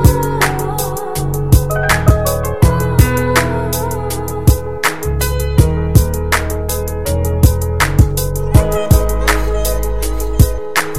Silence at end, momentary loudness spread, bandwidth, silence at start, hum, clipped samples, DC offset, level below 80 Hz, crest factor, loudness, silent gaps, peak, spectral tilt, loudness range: 0 s; 7 LU; 17 kHz; 0 s; none; 0.2%; 4%; -18 dBFS; 14 dB; -15 LUFS; none; 0 dBFS; -5.5 dB/octave; 1 LU